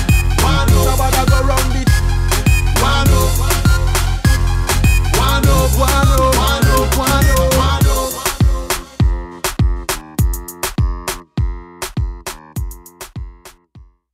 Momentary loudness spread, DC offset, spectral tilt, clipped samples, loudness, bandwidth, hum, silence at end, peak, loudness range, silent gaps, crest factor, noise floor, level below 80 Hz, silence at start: 12 LU; under 0.1%; -4.5 dB/octave; under 0.1%; -15 LUFS; 16.5 kHz; none; 0.35 s; 0 dBFS; 9 LU; none; 14 dB; -44 dBFS; -18 dBFS; 0 s